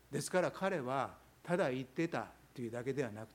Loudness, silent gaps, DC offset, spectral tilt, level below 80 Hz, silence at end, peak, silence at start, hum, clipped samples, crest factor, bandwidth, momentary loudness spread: -38 LUFS; none; under 0.1%; -5.5 dB/octave; -72 dBFS; 0.05 s; -20 dBFS; 0.1 s; none; under 0.1%; 18 dB; 17 kHz; 9 LU